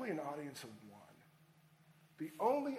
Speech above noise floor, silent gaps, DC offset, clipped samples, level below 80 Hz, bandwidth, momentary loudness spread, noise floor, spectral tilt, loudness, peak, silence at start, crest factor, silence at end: 27 dB; none; under 0.1%; under 0.1%; -88 dBFS; 16 kHz; 24 LU; -68 dBFS; -5.5 dB/octave; -42 LUFS; -22 dBFS; 0 s; 20 dB; 0 s